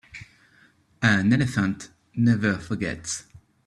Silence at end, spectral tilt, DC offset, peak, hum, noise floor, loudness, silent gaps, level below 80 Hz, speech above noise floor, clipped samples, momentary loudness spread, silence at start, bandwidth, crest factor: 0.45 s; -5.5 dB/octave; under 0.1%; -4 dBFS; none; -59 dBFS; -24 LUFS; none; -54 dBFS; 36 dB; under 0.1%; 16 LU; 0.15 s; 12 kHz; 22 dB